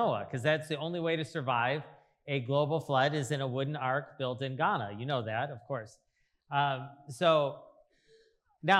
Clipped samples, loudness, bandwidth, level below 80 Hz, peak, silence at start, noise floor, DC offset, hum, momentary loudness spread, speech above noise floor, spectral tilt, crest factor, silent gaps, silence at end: under 0.1%; -32 LUFS; 12.5 kHz; -78 dBFS; -10 dBFS; 0 s; -66 dBFS; under 0.1%; none; 11 LU; 34 dB; -5.5 dB/octave; 22 dB; none; 0 s